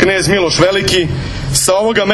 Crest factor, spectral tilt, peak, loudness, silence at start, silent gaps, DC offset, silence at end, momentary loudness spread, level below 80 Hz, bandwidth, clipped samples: 12 dB; -3.5 dB/octave; 0 dBFS; -12 LUFS; 0 s; none; under 0.1%; 0 s; 6 LU; -30 dBFS; 13.5 kHz; under 0.1%